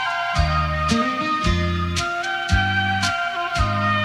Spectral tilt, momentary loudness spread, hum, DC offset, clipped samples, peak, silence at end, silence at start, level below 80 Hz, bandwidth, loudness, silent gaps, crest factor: -4.5 dB/octave; 3 LU; none; under 0.1%; under 0.1%; -6 dBFS; 0 s; 0 s; -30 dBFS; 13 kHz; -21 LUFS; none; 14 dB